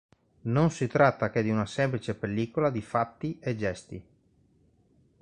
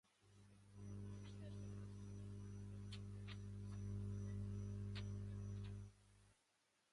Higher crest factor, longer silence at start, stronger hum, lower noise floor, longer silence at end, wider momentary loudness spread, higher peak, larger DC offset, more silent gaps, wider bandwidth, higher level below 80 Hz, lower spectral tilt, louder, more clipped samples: first, 22 dB vs 14 dB; first, 0.45 s vs 0.25 s; second, none vs 50 Hz at -50 dBFS; second, -65 dBFS vs -83 dBFS; first, 1.2 s vs 0.6 s; first, 12 LU vs 8 LU; first, -8 dBFS vs -38 dBFS; neither; neither; second, 10 kHz vs 11.5 kHz; about the same, -58 dBFS vs -62 dBFS; about the same, -7 dB/octave vs -7 dB/octave; first, -28 LUFS vs -53 LUFS; neither